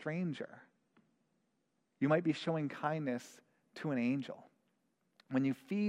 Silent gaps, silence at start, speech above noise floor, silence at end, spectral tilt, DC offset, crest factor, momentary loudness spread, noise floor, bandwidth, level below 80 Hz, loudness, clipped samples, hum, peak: none; 0 s; 45 dB; 0 s; -7 dB/octave; under 0.1%; 20 dB; 16 LU; -81 dBFS; 11 kHz; -84 dBFS; -37 LUFS; under 0.1%; none; -20 dBFS